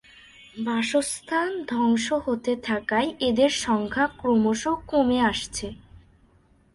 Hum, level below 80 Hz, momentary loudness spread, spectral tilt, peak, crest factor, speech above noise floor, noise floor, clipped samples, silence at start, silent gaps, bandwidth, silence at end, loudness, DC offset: none; -52 dBFS; 7 LU; -4 dB/octave; -8 dBFS; 16 dB; 35 dB; -59 dBFS; under 0.1%; 0.55 s; none; 11.5 kHz; 1 s; -24 LUFS; under 0.1%